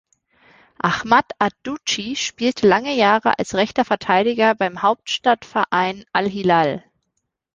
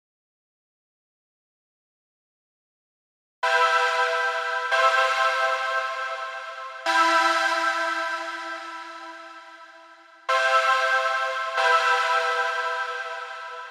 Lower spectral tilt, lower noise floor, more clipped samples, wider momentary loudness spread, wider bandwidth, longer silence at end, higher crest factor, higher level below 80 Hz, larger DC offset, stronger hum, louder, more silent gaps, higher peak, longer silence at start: first, -4 dB/octave vs 1.5 dB/octave; first, -75 dBFS vs -50 dBFS; neither; second, 7 LU vs 16 LU; second, 10 kHz vs 15 kHz; first, 0.75 s vs 0 s; about the same, 18 dB vs 18 dB; first, -58 dBFS vs -82 dBFS; neither; neither; first, -19 LUFS vs -22 LUFS; neither; first, -2 dBFS vs -8 dBFS; second, 0.85 s vs 3.45 s